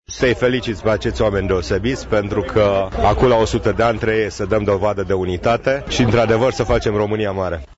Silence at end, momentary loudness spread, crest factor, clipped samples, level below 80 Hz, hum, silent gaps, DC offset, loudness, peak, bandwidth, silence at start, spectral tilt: 0.05 s; 5 LU; 14 dB; under 0.1%; -32 dBFS; none; none; under 0.1%; -18 LUFS; -2 dBFS; 8 kHz; 0.1 s; -6 dB/octave